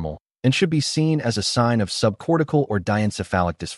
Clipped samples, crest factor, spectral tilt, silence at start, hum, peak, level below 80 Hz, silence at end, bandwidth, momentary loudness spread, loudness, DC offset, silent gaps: under 0.1%; 16 dB; -5.5 dB/octave; 0 s; none; -4 dBFS; -48 dBFS; 0 s; 11.5 kHz; 3 LU; -21 LUFS; under 0.1%; 0.20-0.25 s